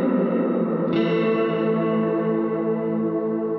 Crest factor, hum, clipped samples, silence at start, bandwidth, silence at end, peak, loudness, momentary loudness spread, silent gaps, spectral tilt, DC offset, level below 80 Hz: 12 dB; none; under 0.1%; 0 s; 5.8 kHz; 0 s; -10 dBFS; -22 LUFS; 3 LU; none; -10 dB/octave; under 0.1%; -72 dBFS